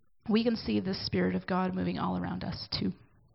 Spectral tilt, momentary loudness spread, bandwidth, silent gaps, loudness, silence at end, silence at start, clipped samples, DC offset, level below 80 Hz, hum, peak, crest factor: -10.5 dB/octave; 7 LU; 5.8 kHz; none; -32 LUFS; 0.4 s; 0.25 s; under 0.1%; under 0.1%; -58 dBFS; none; -16 dBFS; 16 dB